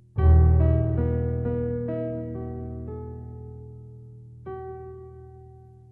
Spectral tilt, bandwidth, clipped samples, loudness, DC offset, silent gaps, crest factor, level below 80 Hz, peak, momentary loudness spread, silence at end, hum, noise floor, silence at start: -13 dB/octave; 2.4 kHz; under 0.1%; -24 LUFS; under 0.1%; none; 18 dB; -30 dBFS; -8 dBFS; 25 LU; 0.35 s; none; -48 dBFS; 0.15 s